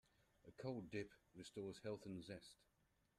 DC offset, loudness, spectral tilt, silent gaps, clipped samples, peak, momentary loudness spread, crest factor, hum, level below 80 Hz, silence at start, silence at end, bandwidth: under 0.1%; -53 LUFS; -6 dB/octave; none; under 0.1%; -36 dBFS; 10 LU; 18 dB; none; -80 dBFS; 0.45 s; 0.55 s; 13 kHz